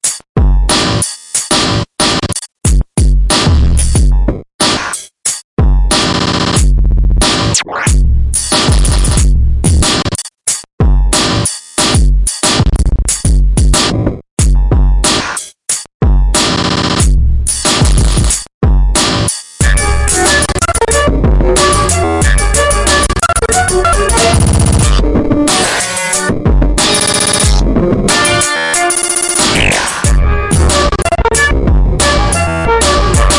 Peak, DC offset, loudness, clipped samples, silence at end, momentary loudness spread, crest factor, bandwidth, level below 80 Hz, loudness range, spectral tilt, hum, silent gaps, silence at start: 0 dBFS; under 0.1%; -11 LUFS; under 0.1%; 0 s; 5 LU; 10 dB; 11.5 kHz; -14 dBFS; 2 LU; -3.5 dB/octave; none; 0.29-0.35 s, 4.54-4.59 s, 5.44-5.57 s, 10.73-10.78 s, 14.31-14.37 s, 15.94-16.00 s, 18.54-18.61 s; 0.05 s